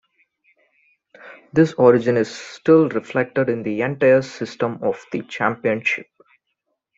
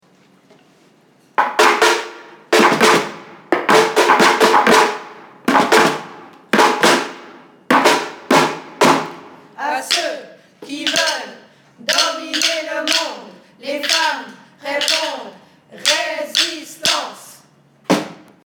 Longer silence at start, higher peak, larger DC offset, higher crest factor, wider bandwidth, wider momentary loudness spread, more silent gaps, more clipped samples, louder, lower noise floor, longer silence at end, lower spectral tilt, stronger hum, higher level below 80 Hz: second, 1.25 s vs 1.4 s; about the same, -2 dBFS vs 0 dBFS; neither; about the same, 18 dB vs 18 dB; second, 7.8 kHz vs over 20 kHz; second, 11 LU vs 18 LU; neither; neither; second, -19 LUFS vs -15 LUFS; first, -75 dBFS vs -53 dBFS; first, 0.95 s vs 0.3 s; first, -7 dB/octave vs -2 dB/octave; neither; about the same, -62 dBFS vs -66 dBFS